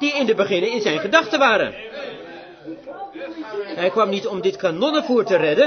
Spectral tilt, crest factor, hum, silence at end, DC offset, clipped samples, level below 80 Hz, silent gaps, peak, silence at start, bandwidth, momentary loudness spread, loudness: -4.5 dB/octave; 20 dB; none; 0 s; under 0.1%; under 0.1%; -64 dBFS; none; 0 dBFS; 0 s; 6.6 kHz; 18 LU; -19 LUFS